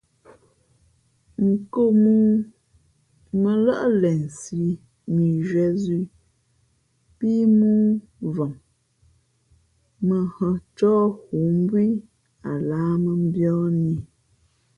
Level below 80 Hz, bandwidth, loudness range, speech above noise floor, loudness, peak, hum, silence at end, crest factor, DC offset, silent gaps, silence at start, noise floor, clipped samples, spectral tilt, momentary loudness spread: -56 dBFS; 9.8 kHz; 4 LU; 45 dB; -22 LUFS; -8 dBFS; none; 0.75 s; 14 dB; under 0.1%; none; 1.4 s; -65 dBFS; under 0.1%; -9 dB/octave; 12 LU